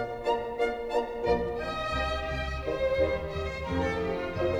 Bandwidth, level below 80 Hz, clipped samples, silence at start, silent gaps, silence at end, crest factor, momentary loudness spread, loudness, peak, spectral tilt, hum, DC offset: 13 kHz; -42 dBFS; under 0.1%; 0 s; none; 0 s; 16 dB; 4 LU; -30 LUFS; -14 dBFS; -6 dB/octave; none; under 0.1%